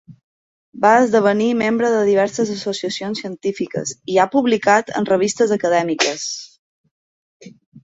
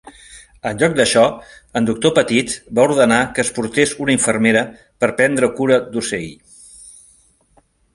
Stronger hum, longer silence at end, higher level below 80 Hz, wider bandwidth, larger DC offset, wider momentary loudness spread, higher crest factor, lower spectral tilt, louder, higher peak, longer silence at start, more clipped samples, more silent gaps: neither; second, 0.05 s vs 1.05 s; second, -64 dBFS vs -50 dBFS; second, 8.2 kHz vs 11.5 kHz; neither; about the same, 10 LU vs 12 LU; about the same, 18 dB vs 18 dB; about the same, -4 dB/octave vs -4 dB/octave; about the same, -18 LUFS vs -16 LUFS; about the same, -2 dBFS vs 0 dBFS; about the same, 0.1 s vs 0.05 s; neither; first, 0.24-0.73 s, 6.59-6.84 s, 6.91-7.40 s, 7.66-7.72 s vs none